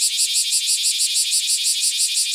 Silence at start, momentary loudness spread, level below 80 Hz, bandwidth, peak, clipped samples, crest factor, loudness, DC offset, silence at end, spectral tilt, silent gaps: 0 s; 1 LU; -70 dBFS; over 20 kHz; -4 dBFS; under 0.1%; 16 dB; -16 LUFS; under 0.1%; 0 s; 7.5 dB/octave; none